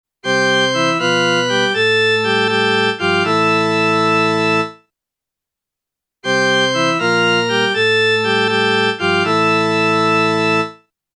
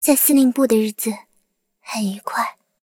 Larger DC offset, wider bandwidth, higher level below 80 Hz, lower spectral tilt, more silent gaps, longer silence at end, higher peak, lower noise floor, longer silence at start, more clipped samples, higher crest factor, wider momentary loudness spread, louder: neither; second, 11 kHz vs 17 kHz; about the same, -66 dBFS vs -68 dBFS; about the same, -4 dB/octave vs -3.5 dB/octave; neither; about the same, 0.45 s vs 0.35 s; about the same, -4 dBFS vs -2 dBFS; first, -84 dBFS vs -67 dBFS; first, 0.25 s vs 0 s; neither; about the same, 12 dB vs 16 dB; second, 3 LU vs 13 LU; first, -14 LUFS vs -19 LUFS